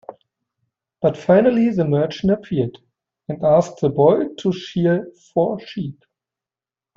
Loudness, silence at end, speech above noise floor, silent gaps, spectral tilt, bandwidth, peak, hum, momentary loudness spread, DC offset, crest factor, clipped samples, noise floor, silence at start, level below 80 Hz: -19 LUFS; 1.05 s; over 72 dB; none; -8 dB/octave; 7.6 kHz; -2 dBFS; none; 12 LU; under 0.1%; 18 dB; under 0.1%; under -90 dBFS; 0.1 s; -54 dBFS